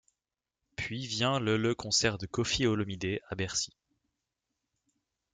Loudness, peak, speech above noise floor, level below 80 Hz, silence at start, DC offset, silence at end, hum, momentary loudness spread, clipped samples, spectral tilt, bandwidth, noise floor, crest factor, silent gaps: -31 LUFS; -14 dBFS; 59 dB; -58 dBFS; 0.8 s; under 0.1%; 1.65 s; none; 10 LU; under 0.1%; -3.5 dB/octave; 9.6 kHz; -90 dBFS; 20 dB; none